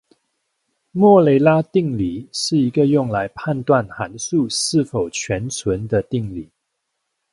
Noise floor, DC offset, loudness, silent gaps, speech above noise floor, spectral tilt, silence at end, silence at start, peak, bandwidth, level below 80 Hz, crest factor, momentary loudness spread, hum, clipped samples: -75 dBFS; under 0.1%; -18 LUFS; none; 58 dB; -5.5 dB/octave; 0.9 s; 0.95 s; 0 dBFS; 11.5 kHz; -48 dBFS; 18 dB; 12 LU; none; under 0.1%